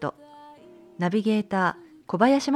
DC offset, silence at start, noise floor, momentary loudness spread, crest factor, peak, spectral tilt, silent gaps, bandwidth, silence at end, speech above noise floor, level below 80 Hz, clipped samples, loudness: under 0.1%; 0 s; -49 dBFS; 13 LU; 18 dB; -6 dBFS; -6 dB/octave; none; 12 kHz; 0 s; 27 dB; -70 dBFS; under 0.1%; -25 LUFS